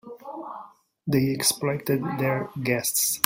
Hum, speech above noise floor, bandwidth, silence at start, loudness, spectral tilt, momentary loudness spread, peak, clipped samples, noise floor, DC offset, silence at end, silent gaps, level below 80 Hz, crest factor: none; 23 dB; 16.5 kHz; 0.05 s; -24 LUFS; -4 dB/octave; 16 LU; 0 dBFS; under 0.1%; -47 dBFS; under 0.1%; 0.05 s; none; -62 dBFS; 26 dB